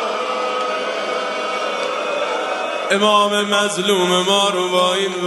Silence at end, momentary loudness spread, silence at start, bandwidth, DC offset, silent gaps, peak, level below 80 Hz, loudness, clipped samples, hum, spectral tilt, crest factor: 0 s; 7 LU; 0 s; 12 kHz; under 0.1%; none; -2 dBFS; -68 dBFS; -18 LUFS; under 0.1%; none; -3 dB/octave; 18 dB